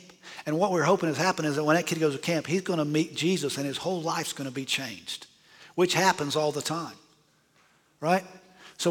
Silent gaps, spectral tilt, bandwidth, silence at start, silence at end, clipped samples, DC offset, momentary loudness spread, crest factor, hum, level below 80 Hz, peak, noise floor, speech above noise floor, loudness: none; -4.5 dB/octave; 18.5 kHz; 0.05 s; 0 s; under 0.1%; under 0.1%; 11 LU; 20 dB; none; -74 dBFS; -8 dBFS; -64 dBFS; 37 dB; -27 LUFS